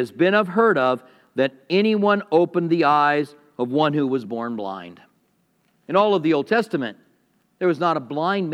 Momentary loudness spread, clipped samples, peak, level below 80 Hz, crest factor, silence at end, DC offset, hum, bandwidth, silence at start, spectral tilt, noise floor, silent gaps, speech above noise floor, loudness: 11 LU; under 0.1%; -4 dBFS; -78 dBFS; 16 dB; 0 s; under 0.1%; none; 11.5 kHz; 0 s; -7 dB/octave; -65 dBFS; none; 45 dB; -21 LUFS